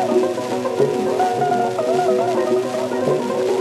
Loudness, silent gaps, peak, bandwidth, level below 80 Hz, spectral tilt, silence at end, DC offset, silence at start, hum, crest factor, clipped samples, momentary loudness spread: -19 LUFS; none; -4 dBFS; 13 kHz; -76 dBFS; -5.5 dB/octave; 0 s; under 0.1%; 0 s; none; 14 dB; under 0.1%; 3 LU